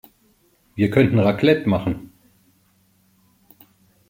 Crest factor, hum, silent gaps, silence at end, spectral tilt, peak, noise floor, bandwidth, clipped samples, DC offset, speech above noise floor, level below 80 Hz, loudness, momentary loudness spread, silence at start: 20 dB; none; none; 2.05 s; -8.5 dB/octave; -2 dBFS; -60 dBFS; 16.5 kHz; under 0.1%; under 0.1%; 43 dB; -52 dBFS; -19 LUFS; 14 LU; 0.75 s